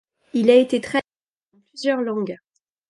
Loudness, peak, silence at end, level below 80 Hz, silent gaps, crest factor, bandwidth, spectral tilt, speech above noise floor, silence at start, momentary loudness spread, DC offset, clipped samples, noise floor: -20 LUFS; -2 dBFS; 0.55 s; -68 dBFS; 1.28-1.41 s; 18 dB; 11.5 kHz; -5.5 dB/octave; 46 dB; 0.35 s; 13 LU; under 0.1%; under 0.1%; -65 dBFS